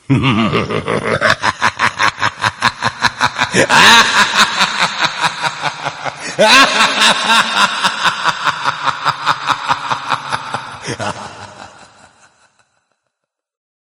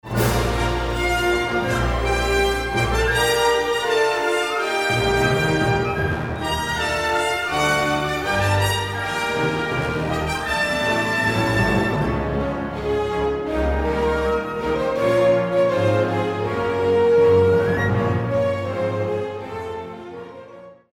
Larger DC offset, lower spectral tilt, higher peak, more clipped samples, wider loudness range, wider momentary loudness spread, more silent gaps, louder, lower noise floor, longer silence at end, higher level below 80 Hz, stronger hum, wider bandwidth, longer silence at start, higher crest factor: neither; second, -2.5 dB/octave vs -5 dB/octave; first, 0 dBFS vs -6 dBFS; first, 0.5% vs under 0.1%; first, 13 LU vs 3 LU; first, 15 LU vs 6 LU; neither; first, -12 LUFS vs -20 LUFS; first, -76 dBFS vs -42 dBFS; first, 2.1 s vs 0.2 s; second, -48 dBFS vs -34 dBFS; neither; about the same, over 20 kHz vs 19 kHz; about the same, 0.1 s vs 0.05 s; about the same, 14 dB vs 14 dB